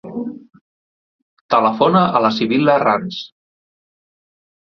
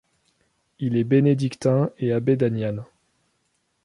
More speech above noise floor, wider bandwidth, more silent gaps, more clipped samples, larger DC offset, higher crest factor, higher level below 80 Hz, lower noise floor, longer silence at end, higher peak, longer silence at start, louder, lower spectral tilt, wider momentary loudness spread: first, over 74 dB vs 50 dB; second, 6.6 kHz vs 11 kHz; first, 0.61-1.49 s vs none; neither; neither; about the same, 18 dB vs 16 dB; about the same, -60 dBFS vs -62 dBFS; first, under -90 dBFS vs -71 dBFS; first, 1.5 s vs 1 s; first, -2 dBFS vs -6 dBFS; second, 0.05 s vs 0.8 s; first, -15 LUFS vs -22 LUFS; second, -7 dB/octave vs -8.5 dB/octave; first, 16 LU vs 10 LU